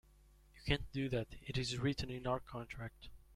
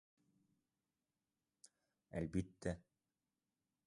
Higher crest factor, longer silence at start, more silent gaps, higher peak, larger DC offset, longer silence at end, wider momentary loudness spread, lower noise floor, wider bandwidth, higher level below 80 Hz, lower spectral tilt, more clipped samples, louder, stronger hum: about the same, 22 dB vs 24 dB; second, 0.55 s vs 2.15 s; neither; first, -20 dBFS vs -26 dBFS; neither; second, 0 s vs 1.05 s; first, 11 LU vs 8 LU; second, -65 dBFS vs under -90 dBFS; first, 14 kHz vs 11 kHz; first, -54 dBFS vs -64 dBFS; second, -5.5 dB/octave vs -7 dB/octave; neither; first, -41 LUFS vs -46 LUFS; neither